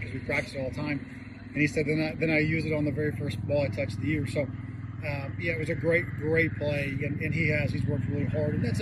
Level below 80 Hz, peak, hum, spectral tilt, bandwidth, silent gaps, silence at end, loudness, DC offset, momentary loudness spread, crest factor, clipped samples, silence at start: -50 dBFS; -12 dBFS; none; -7.5 dB/octave; 12.5 kHz; none; 0 s; -29 LUFS; under 0.1%; 8 LU; 16 dB; under 0.1%; 0 s